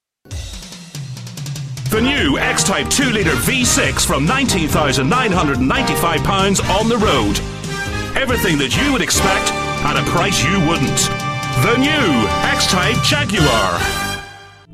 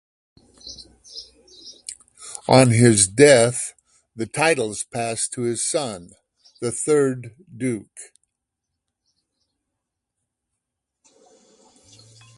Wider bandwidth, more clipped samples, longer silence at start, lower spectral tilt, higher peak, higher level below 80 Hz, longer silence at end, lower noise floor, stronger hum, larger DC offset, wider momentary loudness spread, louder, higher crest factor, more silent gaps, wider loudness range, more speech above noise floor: first, 15.5 kHz vs 11.5 kHz; neither; second, 0.3 s vs 0.65 s; about the same, -3.5 dB/octave vs -4.5 dB/octave; about the same, 0 dBFS vs 0 dBFS; first, -30 dBFS vs -56 dBFS; second, 0 s vs 4.35 s; second, -38 dBFS vs -81 dBFS; neither; neither; second, 13 LU vs 25 LU; first, -15 LUFS vs -19 LUFS; second, 16 dB vs 22 dB; neither; second, 2 LU vs 11 LU; second, 22 dB vs 63 dB